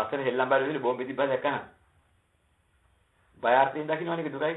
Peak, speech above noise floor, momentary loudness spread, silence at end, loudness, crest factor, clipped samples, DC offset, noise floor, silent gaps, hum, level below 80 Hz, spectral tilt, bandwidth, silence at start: -8 dBFS; 42 dB; 8 LU; 0 s; -27 LUFS; 20 dB; under 0.1%; under 0.1%; -69 dBFS; none; none; -72 dBFS; -8 dB/octave; 4.1 kHz; 0 s